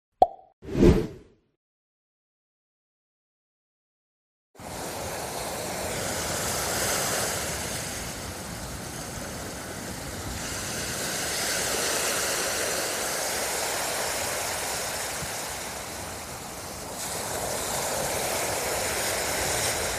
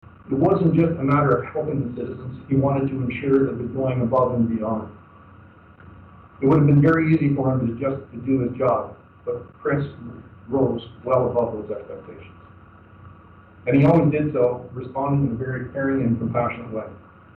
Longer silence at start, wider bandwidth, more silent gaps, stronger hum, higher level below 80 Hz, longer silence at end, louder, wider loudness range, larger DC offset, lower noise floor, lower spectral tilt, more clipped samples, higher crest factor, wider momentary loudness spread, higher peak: about the same, 0.2 s vs 0.25 s; first, 15.5 kHz vs 4.3 kHz; first, 0.53-0.62 s, 1.56-4.54 s vs none; neither; first, -44 dBFS vs -50 dBFS; second, 0 s vs 0.4 s; second, -28 LUFS vs -22 LUFS; first, 8 LU vs 5 LU; neither; first, under -90 dBFS vs -47 dBFS; second, -2.5 dB/octave vs -11 dB/octave; neither; first, 26 dB vs 14 dB; second, 10 LU vs 15 LU; first, -4 dBFS vs -8 dBFS